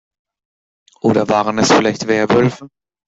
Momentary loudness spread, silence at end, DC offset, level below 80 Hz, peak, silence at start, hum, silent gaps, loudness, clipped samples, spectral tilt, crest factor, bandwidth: 5 LU; 0.4 s; under 0.1%; -52 dBFS; -2 dBFS; 1.05 s; none; none; -15 LUFS; under 0.1%; -5 dB/octave; 14 dB; 8 kHz